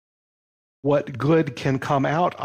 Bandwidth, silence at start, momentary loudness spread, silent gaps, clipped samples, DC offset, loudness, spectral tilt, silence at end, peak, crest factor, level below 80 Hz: 10.5 kHz; 0.85 s; 4 LU; none; under 0.1%; under 0.1%; -22 LUFS; -7.5 dB/octave; 0 s; -8 dBFS; 14 dB; -60 dBFS